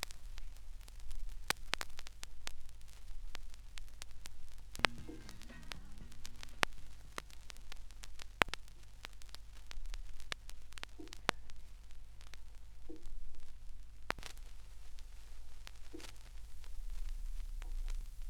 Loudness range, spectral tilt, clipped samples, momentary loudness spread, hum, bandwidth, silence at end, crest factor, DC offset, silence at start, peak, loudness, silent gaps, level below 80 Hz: 10 LU; -2.5 dB/octave; under 0.1%; 20 LU; none; 16 kHz; 0 s; 36 dB; under 0.1%; 0 s; -4 dBFS; -45 LUFS; none; -48 dBFS